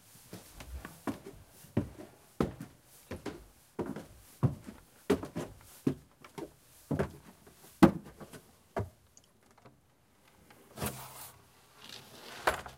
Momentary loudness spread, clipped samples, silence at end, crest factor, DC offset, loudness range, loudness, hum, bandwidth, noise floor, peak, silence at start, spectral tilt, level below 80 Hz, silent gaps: 19 LU; under 0.1%; 0 s; 32 dB; under 0.1%; 11 LU; -36 LUFS; none; 16 kHz; -67 dBFS; -6 dBFS; 0.3 s; -6 dB/octave; -56 dBFS; none